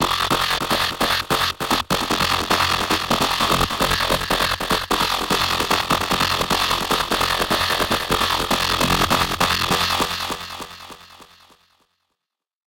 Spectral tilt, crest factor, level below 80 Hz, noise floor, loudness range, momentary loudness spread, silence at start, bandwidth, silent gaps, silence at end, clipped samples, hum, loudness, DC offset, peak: -2.5 dB/octave; 18 dB; -38 dBFS; -84 dBFS; 3 LU; 3 LU; 0 s; 17.5 kHz; none; 1.55 s; under 0.1%; none; -19 LUFS; under 0.1%; -4 dBFS